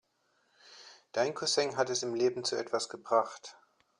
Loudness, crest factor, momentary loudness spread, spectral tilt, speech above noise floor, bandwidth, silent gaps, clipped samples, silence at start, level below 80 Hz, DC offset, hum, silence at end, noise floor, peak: -32 LUFS; 22 dB; 21 LU; -2.5 dB/octave; 42 dB; 11 kHz; none; under 0.1%; 0.65 s; -80 dBFS; under 0.1%; none; 0.45 s; -74 dBFS; -12 dBFS